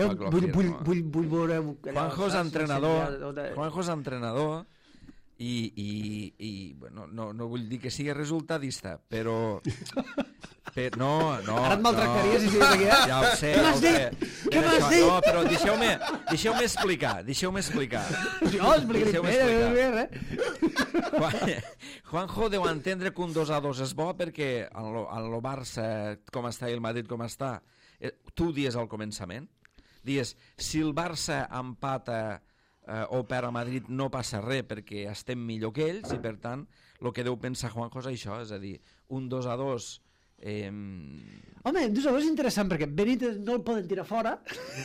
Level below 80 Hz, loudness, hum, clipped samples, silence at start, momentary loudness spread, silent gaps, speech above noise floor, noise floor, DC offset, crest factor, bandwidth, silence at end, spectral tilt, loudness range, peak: -50 dBFS; -28 LUFS; none; under 0.1%; 0 s; 16 LU; none; 24 dB; -53 dBFS; under 0.1%; 20 dB; 16 kHz; 0 s; -5 dB/octave; 13 LU; -8 dBFS